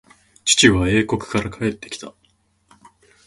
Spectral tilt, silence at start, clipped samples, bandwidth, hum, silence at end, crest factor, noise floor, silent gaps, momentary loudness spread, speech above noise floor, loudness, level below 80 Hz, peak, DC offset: -3.5 dB/octave; 0.45 s; under 0.1%; 11.5 kHz; none; 1.15 s; 22 dB; -62 dBFS; none; 20 LU; 44 dB; -18 LUFS; -40 dBFS; 0 dBFS; under 0.1%